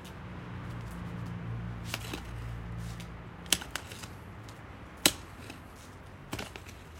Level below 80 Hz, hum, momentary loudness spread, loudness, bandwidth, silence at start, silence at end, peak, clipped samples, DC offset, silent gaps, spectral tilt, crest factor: -50 dBFS; none; 19 LU; -36 LUFS; 16.5 kHz; 0 s; 0 s; -2 dBFS; under 0.1%; under 0.1%; none; -2.5 dB/octave; 36 dB